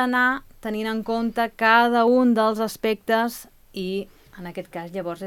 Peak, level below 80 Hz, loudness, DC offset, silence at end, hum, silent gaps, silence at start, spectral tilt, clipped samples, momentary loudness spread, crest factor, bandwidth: -4 dBFS; -56 dBFS; -22 LUFS; under 0.1%; 0 s; none; none; 0 s; -5 dB/octave; under 0.1%; 18 LU; 20 dB; 18 kHz